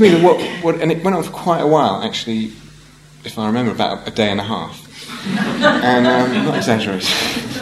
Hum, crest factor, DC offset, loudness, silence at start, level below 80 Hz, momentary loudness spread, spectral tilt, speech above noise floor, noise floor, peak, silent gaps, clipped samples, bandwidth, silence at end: none; 16 dB; under 0.1%; -16 LUFS; 0 s; -50 dBFS; 13 LU; -5 dB/octave; 27 dB; -43 dBFS; 0 dBFS; none; under 0.1%; 14.5 kHz; 0 s